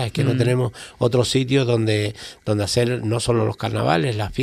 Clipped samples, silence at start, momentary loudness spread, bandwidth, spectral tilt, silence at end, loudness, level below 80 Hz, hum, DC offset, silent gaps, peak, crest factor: under 0.1%; 0 s; 5 LU; 14 kHz; -5.5 dB/octave; 0 s; -21 LUFS; -46 dBFS; none; under 0.1%; none; -4 dBFS; 16 dB